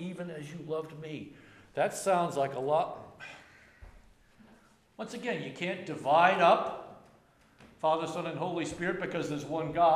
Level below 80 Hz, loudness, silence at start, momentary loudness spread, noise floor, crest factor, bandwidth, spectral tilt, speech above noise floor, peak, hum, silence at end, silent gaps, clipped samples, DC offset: -66 dBFS; -31 LUFS; 0 s; 20 LU; -63 dBFS; 22 dB; 14 kHz; -5 dB/octave; 32 dB; -10 dBFS; none; 0 s; none; under 0.1%; under 0.1%